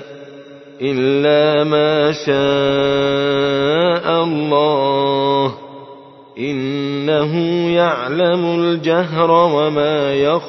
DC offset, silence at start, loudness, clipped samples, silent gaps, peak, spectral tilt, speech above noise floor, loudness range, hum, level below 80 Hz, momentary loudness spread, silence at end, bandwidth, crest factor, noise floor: under 0.1%; 0 s; -15 LUFS; under 0.1%; none; 0 dBFS; -6.5 dB/octave; 24 dB; 3 LU; none; -54 dBFS; 8 LU; 0 s; 6.2 kHz; 14 dB; -39 dBFS